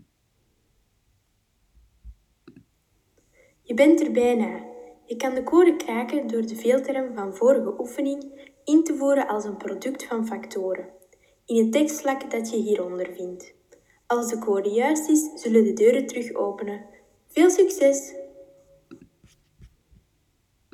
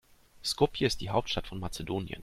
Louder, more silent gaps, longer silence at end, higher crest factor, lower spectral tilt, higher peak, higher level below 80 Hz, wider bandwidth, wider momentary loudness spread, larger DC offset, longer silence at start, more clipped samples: first, -23 LUFS vs -32 LUFS; neither; first, 1.05 s vs 0 s; about the same, 20 dB vs 22 dB; about the same, -4.5 dB/octave vs -4.5 dB/octave; first, -6 dBFS vs -12 dBFS; second, -62 dBFS vs -48 dBFS; about the same, 16 kHz vs 15.5 kHz; first, 16 LU vs 10 LU; neither; first, 2.05 s vs 0.35 s; neither